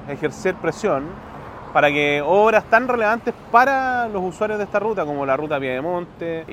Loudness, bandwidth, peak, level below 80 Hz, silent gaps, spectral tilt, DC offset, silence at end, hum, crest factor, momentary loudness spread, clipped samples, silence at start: -20 LUFS; 15.5 kHz; 0 dBFS; -50 dBFS; none; -5.5 dB/octave; under 0.1%; 0 s; none; 20 dB; 11 LU; under 0.1%; 0 s